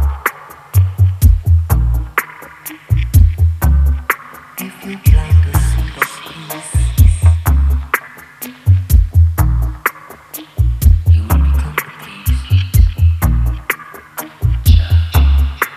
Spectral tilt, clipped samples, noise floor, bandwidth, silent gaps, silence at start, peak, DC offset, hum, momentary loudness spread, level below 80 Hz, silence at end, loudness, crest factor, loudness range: -5.5 dB/octave; under 0.1%; -33 dBFS; 15.5 kHz; none; 0 s; 0 dBFS; under 0.1%; none; 16 LU; -16 dBFS; 0 s; -14 LUFS; 12 dB; 2 LU